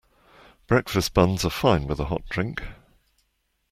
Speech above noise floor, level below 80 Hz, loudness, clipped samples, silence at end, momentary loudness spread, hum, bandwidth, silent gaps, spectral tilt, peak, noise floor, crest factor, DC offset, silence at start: 49 dB; -40 dBFS; -24 LUFS; under 0.1%; 1 s; 9 LU; none; 16.5 kHz; none; -5.5 dB/octave; -4 dBFS; -72 dBFS; 22 dB; under 0.1%; 0.7 s